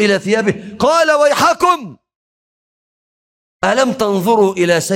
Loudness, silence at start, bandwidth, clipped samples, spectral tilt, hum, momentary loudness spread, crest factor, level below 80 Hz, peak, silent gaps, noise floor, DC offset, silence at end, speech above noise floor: -14 LUFS; 0 s; 16.5 kHz; under 0.1%; -4 dB/octave; none; 6 LU; 14 dB; -54 dBFS; -2 dBFS; 2.15-3.60 s; under -90 dBFS; under 0.1%; 0 s; over 77 dB